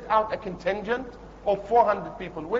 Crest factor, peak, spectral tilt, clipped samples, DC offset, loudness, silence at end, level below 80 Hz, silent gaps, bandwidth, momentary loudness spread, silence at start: 18 dB; -8 dBFS; -6.5 dB/octave; under 0.1%; under 0.1%; -26 LUFS; 0 s; -50 dBFS; none; 7.6 kHz; 14 LU; 0 s